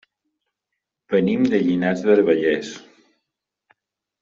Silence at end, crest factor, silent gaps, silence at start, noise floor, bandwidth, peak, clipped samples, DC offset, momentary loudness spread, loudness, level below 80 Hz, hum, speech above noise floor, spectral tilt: 1.4 s; 18 dB; none; 1.1 s; -82 dBFS; 7.6 kHz; -4 dBFS; under 0.1%; under 0.1%; 11 LU; -19 LUFS; -62 dBFS; none; 63 dB; -6.5 dB/octave